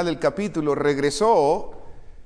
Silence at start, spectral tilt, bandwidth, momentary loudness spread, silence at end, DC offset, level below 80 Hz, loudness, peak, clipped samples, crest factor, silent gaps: 0 s; -5 dB/octave; 10.5 kHz; 8 LU; 0 s; under 0.1%; -44 dBFS; -21 LUFS; -8 dBFS; under 0.1%; 14 dB; none